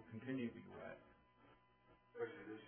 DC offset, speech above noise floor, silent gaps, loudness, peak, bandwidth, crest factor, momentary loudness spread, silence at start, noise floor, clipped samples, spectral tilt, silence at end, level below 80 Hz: under 0.1%; 23 dB; none; -50 LUFS; -34 dBFS; 3.3 kHz; 18 dB; 13 LU; 0 s; -72 dBFS; under 0.1%; -4.5 dB/octave; 0 s; -82 dBFS